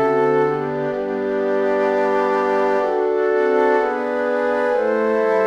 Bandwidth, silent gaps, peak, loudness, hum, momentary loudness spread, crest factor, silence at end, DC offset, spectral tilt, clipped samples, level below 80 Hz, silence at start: 8 kHz; none; -6 dBFS; -19 LUFS; none; 5 LU; 12 dB; 0 s; under 0.1%; -7 dB/octave; under 0.1%; -58 dBFS; 0 s